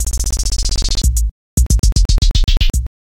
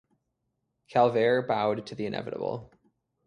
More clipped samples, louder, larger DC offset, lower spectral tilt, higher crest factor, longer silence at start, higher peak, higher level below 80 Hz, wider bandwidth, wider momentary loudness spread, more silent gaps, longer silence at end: neither; first, -17 LUFS vs -28 LUFS; neither; second, -3.5 dB/octave vs -7 dB/octave; second, 12 dB vs 20 dB; second, 0 s vs 0.9 s; first, -2 dBFS vs -10 dBFS; first, -14 dBFS vs -68 dBFS; first, 16 kHz vs 10 kHz; second, 5 LU vs 11 LU; first, 1.31-1.57 s, 1.79-1.83 s vs none; second, 0.3 s vs 0.6 s